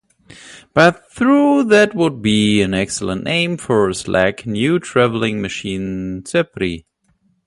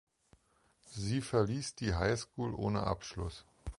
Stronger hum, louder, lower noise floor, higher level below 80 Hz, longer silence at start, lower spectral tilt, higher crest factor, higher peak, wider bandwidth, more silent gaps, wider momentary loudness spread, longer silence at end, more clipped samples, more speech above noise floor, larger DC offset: neither; first, -16 LUFS vs -36 LUFS; second, -61 dBFS vs -71 dBFS; about the same, -46 dBFS vs -50 dBFS; second, 0.45 s vs 0.85 s; about the same, -5 dB/octave vs -5.5 dB/octave; about the same, 16 dB vs 20 dB; first, 0 dBFS vs -16 dBFS; about the same, 11.5 kHz vs 11.5 kHz; neither; about the same, 11 LU vs 11 LU; first, 0.65 s vs 0.05 s; neither; first, 45 dB vs 36 dB; neither